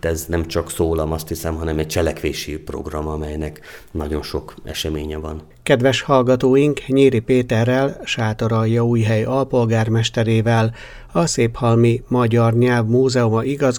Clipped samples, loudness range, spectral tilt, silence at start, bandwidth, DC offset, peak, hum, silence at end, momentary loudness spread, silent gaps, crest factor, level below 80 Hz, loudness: under 0.1%; 8 LU; -6 dB/octave; 0.05 s; 18.5 kHz; under 0.1%; 0 dBFS; none; 0 s; 13 LU; none; 18 dB; -36 dBFS; -18 LUFS